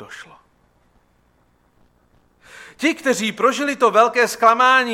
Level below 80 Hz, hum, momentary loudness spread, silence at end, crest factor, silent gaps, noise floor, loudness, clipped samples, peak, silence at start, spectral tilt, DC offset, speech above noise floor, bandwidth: -64 dBFS; none; 8 LU; 0 s; 18 dB; none; -60 dBFS; -16 LUFS; under 0.1%; -2 dBFS; 0 s; -2.5 dB/octave; under 0.1%; 43 dB; 16 kHz